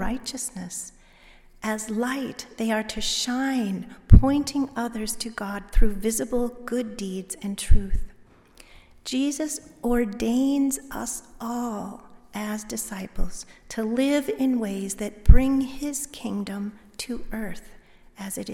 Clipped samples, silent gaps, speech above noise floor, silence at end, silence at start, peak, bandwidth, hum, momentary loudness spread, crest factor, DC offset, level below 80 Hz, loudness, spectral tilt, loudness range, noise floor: under 0.1%; none; 29 dB; 0 s; 0 s; 0 dBFS; 16 kHz; none; 13 LU; 24 dB; under 0.1%; -28 dBFS; -26 LUFS; -5 dB/octave; 6 LU; -52 dBFS